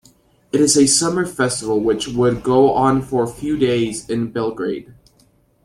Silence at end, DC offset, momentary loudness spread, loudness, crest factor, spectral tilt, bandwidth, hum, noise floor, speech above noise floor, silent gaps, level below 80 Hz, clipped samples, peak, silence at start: 0.7 s; under 0.1%; 10 LU; -17 LUFS; 16 dB; -4 dB/octave; 14.5 kHz; none; -56 dBFS; 39 dB; none; -48 dBFS; under 0.1%; -2 dBFS; 0.55 s